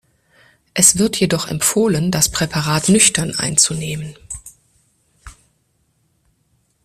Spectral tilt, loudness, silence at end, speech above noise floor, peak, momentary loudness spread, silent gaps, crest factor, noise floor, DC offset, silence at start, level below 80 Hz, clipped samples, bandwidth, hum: -3 dB/octave; -15 LUFS; 1.55 s; 47 dB; 0 dBFS; 17 LU; none; 20 dB; -64 dBFS; under 0.1%; 0.75 s; -46 dBFS; under 0.1%; 16 kHz; none